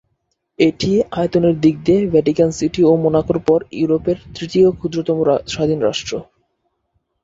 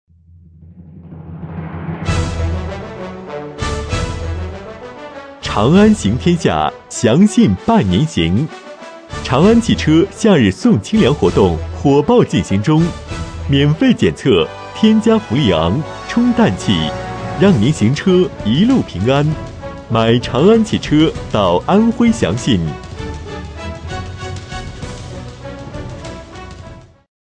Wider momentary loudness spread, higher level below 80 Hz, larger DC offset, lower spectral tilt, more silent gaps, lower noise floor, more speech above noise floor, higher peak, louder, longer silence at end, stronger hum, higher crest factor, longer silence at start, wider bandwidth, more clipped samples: second, 7 LU vs 18 LU; second, -46 dBFS vs -32 dBFS; neither; about the same, -6.5 dB/octave vs -6.5 dB/octave; neither; first, -70 dBFS vs -44 dBFS; first, 54 dB vs 31 dB; about the same, -2 dBFS vs 0 dBFS; about the same, -16 LUFS vs -14 LUFS; first, 1 s vs 0.5 s; neither; about the same, 16 dB vs 14 dB; about the same, 0.6 s vs 0.65 s; second, 7.8 kHz vs 10 kHz; neither